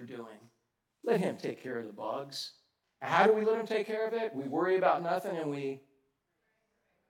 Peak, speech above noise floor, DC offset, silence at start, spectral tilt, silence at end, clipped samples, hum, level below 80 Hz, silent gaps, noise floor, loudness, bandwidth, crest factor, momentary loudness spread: -10 dBFS; 48 dB; under 0.1%; 0 s; -5.5 dB/octave; 1.3 s; under 0.1%; none; under -90 dBFS; none; -79 dBFS; -32 LUFS; 16.5 kHz; 22 dB; 17 LU